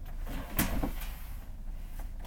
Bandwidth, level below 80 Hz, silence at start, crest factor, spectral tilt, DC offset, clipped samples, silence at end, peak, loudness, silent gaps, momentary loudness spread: over 20 kHz; -38 dBFS; 0 s; 24 dB; -4.5 dB/octave; under 0.1%; under 0.1%; 0 s; -12 dBFS; -38 LUFS; none; 14 LU